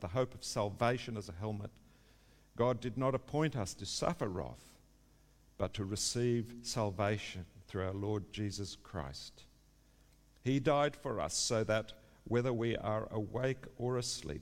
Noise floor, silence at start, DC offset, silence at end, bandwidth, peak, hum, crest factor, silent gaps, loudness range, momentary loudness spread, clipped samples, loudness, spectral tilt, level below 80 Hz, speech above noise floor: -66 dBFS; 0 s; under 0.1%; 0 s; 16 kHz; -18 dBFS; none; 20 dB; none; 5 LU; 12 LU; under 0.1%; -37 LUFS; -5 dB/octave; -60 dBFS; 29 dB